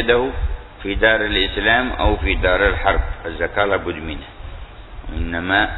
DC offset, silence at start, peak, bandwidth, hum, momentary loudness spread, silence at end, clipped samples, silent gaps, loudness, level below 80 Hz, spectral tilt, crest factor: under 0.1%; 0 s; -2 dBFS; 4.1 kHz; none; 19 LU; 0 s; under 0.1%; none; -19 LUFS; -26 dBFS; -8 dB/octave; 16 dB